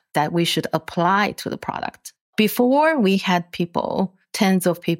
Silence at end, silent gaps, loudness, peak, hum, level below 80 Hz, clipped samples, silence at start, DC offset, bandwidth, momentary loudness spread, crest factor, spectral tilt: 0 s; 2.21-2.33 s; -20 LUFS; -4 dBFS; none; -60 dBFS; under 0.1%; 0.15 s; under 0.1%; 16.5 kHz; 11 LU; 16 dB; -5 dB/octave